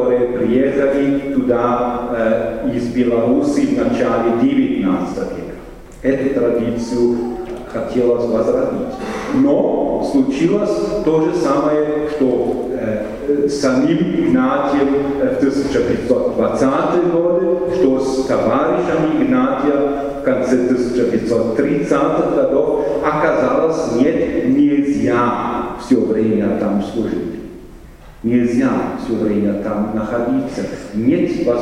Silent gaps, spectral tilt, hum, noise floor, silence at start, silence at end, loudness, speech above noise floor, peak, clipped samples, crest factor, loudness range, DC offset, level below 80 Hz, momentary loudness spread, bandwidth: none; -7 dB/octave; none; -37 dBFS; 0 s; 0 s; -16 LUFS; 22 dB; 0 dBFS; under 0.1%; 16 dB; 3 LU; under 0.1%; -40 dBFS; 6 LU; 11 kHz